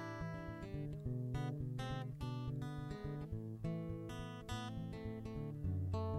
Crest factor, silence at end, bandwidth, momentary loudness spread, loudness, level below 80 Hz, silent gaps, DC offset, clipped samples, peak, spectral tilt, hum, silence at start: 14 dB; 0 s; 14.5 kHz; 5 LU; -45 LUFS; -56 dBFS; none; under 0.1%; under 0.1%; -28 dBFS; -7.5 dB/octave; none; 0 s